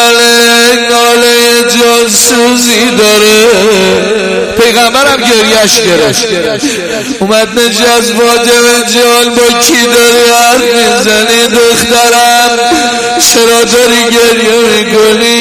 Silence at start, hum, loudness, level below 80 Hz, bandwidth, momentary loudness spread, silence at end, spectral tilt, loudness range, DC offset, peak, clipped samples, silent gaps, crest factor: 0 s; none; -5 LUFS; -40 dBFS; over 20 kHz; 5 LU; 0 s; -1.5 dB/octave; 2 LU; under 0.1%; 0 dBFS; 2%; none; 6 dB